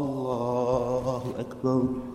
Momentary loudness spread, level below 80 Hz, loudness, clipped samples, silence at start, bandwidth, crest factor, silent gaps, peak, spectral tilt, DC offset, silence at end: 5 LU; -52 dBFS; -28 LUFS; under 0.1%; 0 s; 13 kHz; 16 dB; none; -12 dBFS; -8 dB/octave; under 0.1%; 0 s